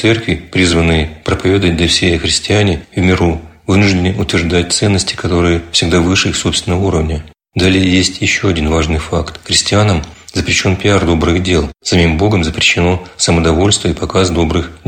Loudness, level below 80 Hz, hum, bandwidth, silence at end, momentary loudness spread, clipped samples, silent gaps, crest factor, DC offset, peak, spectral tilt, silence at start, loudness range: -12 LUFS; -26 dBFS; none; 16 kHz; 0.1 s; 5 LU; under 0.1%; none; 12 dB; under 0.1%; 0 dBFS; -4.5 dB/octave; 0 s; 1 LU